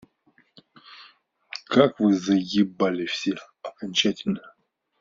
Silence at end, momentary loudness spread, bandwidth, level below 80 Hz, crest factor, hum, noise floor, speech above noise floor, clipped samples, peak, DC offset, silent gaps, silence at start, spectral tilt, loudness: 0.5 s; 16 LU; 7.6 kHz; -66 dBFS; 24 dB; none; -63 dBFS; 41 dB; under 0.1%; -2 dBFS; under 0.1%; none; 0.9 s; -4 dB/octave; -23 LUFS